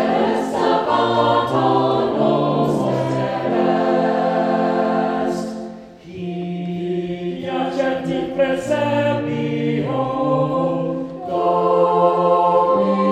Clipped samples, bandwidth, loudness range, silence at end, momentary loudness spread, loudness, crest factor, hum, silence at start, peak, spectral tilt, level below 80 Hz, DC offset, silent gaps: under 0.1%; 11.5 kHz; 6 LU; 0 s; 10 LU; -19 LUFS; 16 dB; none; 0 s; -4 dBFS; -7 dB/octave; -54 dBFS; under 0.1%; none